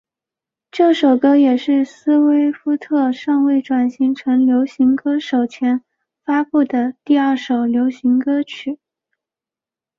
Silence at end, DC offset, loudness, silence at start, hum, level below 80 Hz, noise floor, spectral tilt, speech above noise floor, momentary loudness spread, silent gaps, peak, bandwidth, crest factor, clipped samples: 1.25 s; under 0.1%; -16 LUFS; 0.75 s; none; -66 dBFS; -89 dBFS; -5.5 dB/octave; 74 dB; 7 LU; none; -2 dBFS; 7.2 kHz; 14 dB; under 0.1%